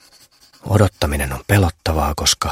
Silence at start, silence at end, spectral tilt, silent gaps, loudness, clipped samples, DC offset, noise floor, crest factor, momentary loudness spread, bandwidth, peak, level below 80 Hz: 0.65 s; 0 s; -4.5 dB/octave; none; -18 LUFS; under 0.1%; under 0.1%; -50 dBFS; 18 dB; 5 LU; 16.5 kHz; 0 dBFS; -30 dBFS